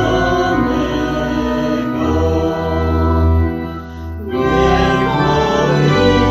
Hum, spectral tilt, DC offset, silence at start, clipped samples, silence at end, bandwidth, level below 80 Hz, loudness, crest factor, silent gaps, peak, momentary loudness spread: none; -7 dB/octave; under 0.1%; 0 s; under 0.1%; 0 s; 13.5 kHz; -24 dBFS; -15 LUFS; 14 dB; none; 0 dBFS; 7 LU